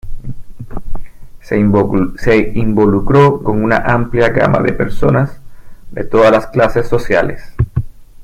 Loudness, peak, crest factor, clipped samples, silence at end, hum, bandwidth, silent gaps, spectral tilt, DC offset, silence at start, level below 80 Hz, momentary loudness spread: -13 LUFS; 0 dBFS; 12 dB; under 0.1%; 0 s; none; 10.5 kHz; none; -8 dB/octave; under 0.1%; 0.05 s; -26 dBFS; 21 LU